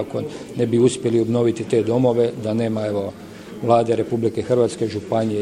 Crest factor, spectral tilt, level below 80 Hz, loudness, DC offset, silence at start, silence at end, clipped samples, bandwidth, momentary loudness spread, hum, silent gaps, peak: 18 dB; -7 dB/octave; -56 dBFS; -20 LUFS; under 0.1%; 0 s; 0 s; under 0.1%; 12 kHz; 10 LU; none; none; -2 dBFS